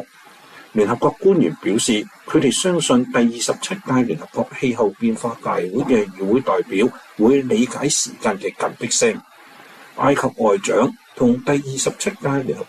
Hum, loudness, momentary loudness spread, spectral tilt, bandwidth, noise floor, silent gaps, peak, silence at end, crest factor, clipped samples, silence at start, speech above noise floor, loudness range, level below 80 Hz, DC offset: none; -19 LUFS; 7 LU; -4 dB/octave; 14 kHz; -46 dBFS; none; -4 dBFS; 0.05 s; 14 dB; under 0.1%; 0 s; 27 dB; 2 LU; -56 dBFS; under 0.1%